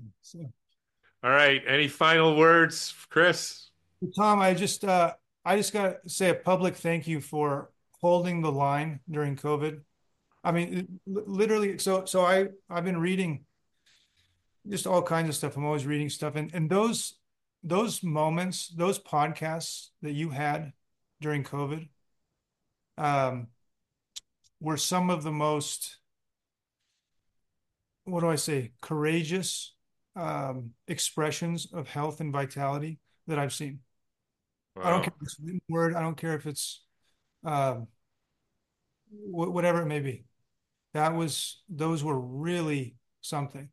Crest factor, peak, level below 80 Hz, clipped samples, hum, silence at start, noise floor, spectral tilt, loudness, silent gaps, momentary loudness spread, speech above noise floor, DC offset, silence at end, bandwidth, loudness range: 22 dB; -8 dBFS; -74 dBFS; under 0.1%; none; 0 s; -88 dBFS; -4.5 dB/octave; -28 LUFS; none; 16 LU; 60 dB; under 0.1%; 0.05 s; 12.5 kHz; 10 LU